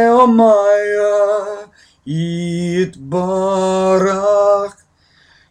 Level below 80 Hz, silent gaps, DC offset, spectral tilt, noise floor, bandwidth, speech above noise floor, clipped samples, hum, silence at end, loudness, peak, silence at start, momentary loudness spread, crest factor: -54 dBFS; none; under 0.1%; -6.5 dB/octave; -53 dBFS; 10 kHz; 40 dB; under 0.1%; none; 0.8 s; -14 LUFS; 0 dBFS; 0 s; 11 LU; 14 dB